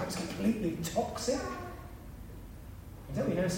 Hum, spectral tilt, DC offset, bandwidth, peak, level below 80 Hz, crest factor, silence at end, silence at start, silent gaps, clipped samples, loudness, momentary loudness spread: none; -5.5 dB/octave; under 0.1%; 16 kHz; -18 dBFS; -50 dBFS; 16 dB; 0 s; 0 s; none; under 0.1%; -34 LUFS; 17 LU